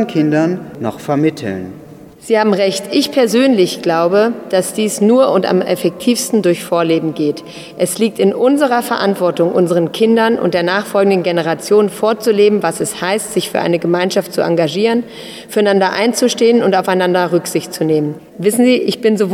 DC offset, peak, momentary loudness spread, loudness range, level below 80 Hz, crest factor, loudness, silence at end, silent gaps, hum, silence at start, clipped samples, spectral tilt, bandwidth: under 0.1%; 0 dBFS; 7 LU; 2 LU; -60 dBFS; 14 dB; -14 LUFS; 0 s; none; none; 0 s; under 0.1%; -5 dB/octave; 16.5 kHz